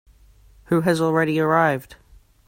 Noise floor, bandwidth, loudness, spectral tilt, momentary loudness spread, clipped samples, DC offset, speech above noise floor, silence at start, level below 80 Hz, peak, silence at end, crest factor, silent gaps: -51 dBFS; 16.5 kHz; -20 LUFS; -6.5 dB/octave; 5 LU; under 0.1%; under 0.1%; 32 dB; 0.7 s; -54 dBFS; -4 dBFS; 0.55 s; 18 dB; none